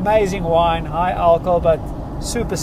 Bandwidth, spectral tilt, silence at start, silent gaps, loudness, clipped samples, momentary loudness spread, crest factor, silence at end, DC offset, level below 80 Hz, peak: 15 kHz; -5.5 dB/octave; 0 s; none; -18 LUFS; under 0.1%; 9 LU; 14 dB; 0 s; under 0.1%; -30 dBFS; -2 dBFS